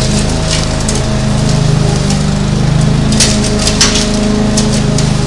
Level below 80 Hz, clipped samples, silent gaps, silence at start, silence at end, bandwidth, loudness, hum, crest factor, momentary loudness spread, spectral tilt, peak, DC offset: -20 dBFS; 0.1%; none; 0 s; 0 s; 12 kHz; -11 LUFS; none; 10 dB; 4 LU; -4.5 dB/octave; 0 dBFS; under 0.1%